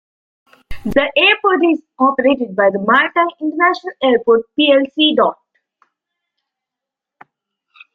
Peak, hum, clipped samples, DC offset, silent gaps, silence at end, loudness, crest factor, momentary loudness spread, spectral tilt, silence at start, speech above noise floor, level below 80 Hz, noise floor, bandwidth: 0 dBFS; none; under 0.1%; under 0.1%; none; 2.6 s; -14 LUFS; 16 dB; 6 LU; -6 dB/octave; 0.7 s; 70 dB; -46 dBFS; -84 dBFS; 6.6 kHz